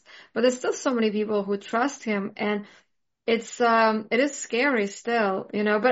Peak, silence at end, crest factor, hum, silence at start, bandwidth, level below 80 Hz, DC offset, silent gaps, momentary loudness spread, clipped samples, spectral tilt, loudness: -8 dBFS; 0 s; 16 dB; none; 0.15 s; 8 kHz; -74 dBFS; under 0.1%; none; 7 LU; under 0.1%; -3 dB/octave; -25 LUFS